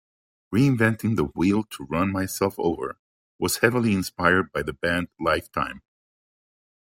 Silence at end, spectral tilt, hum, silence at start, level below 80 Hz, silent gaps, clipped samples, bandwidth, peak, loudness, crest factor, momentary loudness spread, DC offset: 1.1 s; -5.5 dB/octave; none; 0.5 s; -52 dBFS; 2.99-3.39 s; under 0.1%; 16.5 kHz; -2 dBFS; -24 LUFS; 22 dB; 9 LU; under 0.1%